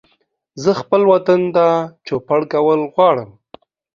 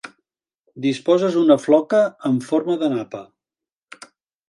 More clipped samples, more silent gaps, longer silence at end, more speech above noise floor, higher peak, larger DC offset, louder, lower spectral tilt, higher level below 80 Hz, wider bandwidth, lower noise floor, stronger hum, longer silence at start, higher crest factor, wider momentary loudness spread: neither; second, none vs 0.60-0.64 s; second, 0.7 s vs 1.25 s; second, 48 dB vs 71 dB; about the same, -2 dBFS vs -2 dBFS; neither; first, -16 LUFS vs -19 LUFS; about the same, -6.5 dB/octave vs -6.5 dB/octave; first, -60 dBFS vs -72 dBFS; second, 7.4 kHz vs 11.5 kHz; second, -63 dBFS vs -90 dBFS; neither; first, 0.55 s vs 0.05 s; about the same, 14 dB vs 18 dB; about the same, 9 LU vs 10 LU